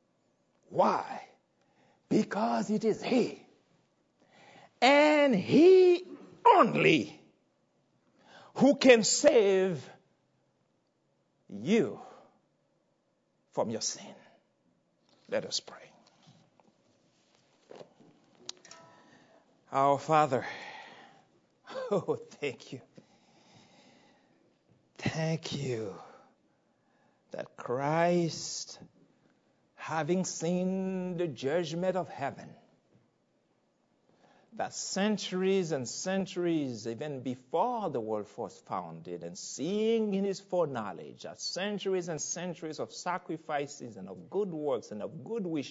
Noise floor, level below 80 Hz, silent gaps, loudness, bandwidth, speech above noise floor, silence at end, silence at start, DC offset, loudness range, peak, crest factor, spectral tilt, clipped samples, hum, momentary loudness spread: -75 dBFS; -78 dBFS; none; -30 LUFS; 8 kHz; 46 dB; 0 s; 0.7 s; under 0.1%; 14 LU; -6 dBFS; 26 dB; -4.5 dB/octave; under 0.1%; none; 21 LU